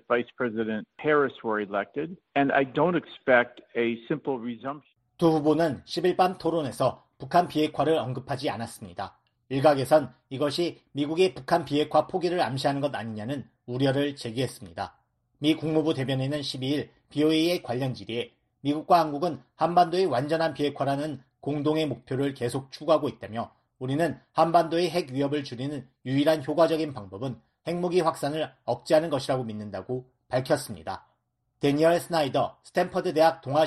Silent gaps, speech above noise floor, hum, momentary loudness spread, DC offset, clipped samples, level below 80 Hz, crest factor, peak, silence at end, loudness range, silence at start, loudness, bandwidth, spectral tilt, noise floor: none; 48 dB; none; 13 LU; under 0.1%; under 0.1%; -64 dBFS; 20 dB; -8 dBFS; 0 s; 3 LU; 0.1 s; -27 LUFS; 13 kHz; -6 dB/octave; -75 dBFS